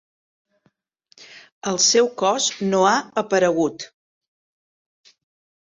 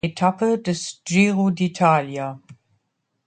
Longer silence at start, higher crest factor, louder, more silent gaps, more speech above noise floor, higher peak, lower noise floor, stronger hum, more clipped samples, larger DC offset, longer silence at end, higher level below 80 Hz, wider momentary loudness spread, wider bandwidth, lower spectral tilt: first, 1.2 s vs 0.05 s; about the same, 18 dB vs 18 dB; about the same, -19 LUFS vs -20 LUFS; first, 1.52-1.61 s vs none; second, 47 dB vs 53 dB; about the same, -4 dBFS vs -2 dBFS; second, -67 dBFS vs -73 dBFS; neither; neither; neither; first, 1.9 s vs 0.75 s; second, -68 dBFS vs -60 dBFS; about the same, 13 LU vs 11 LU; second, 8 kHz vs 9.4 kHz; second, -2.5 dB/octave vs -5.5 dB/octave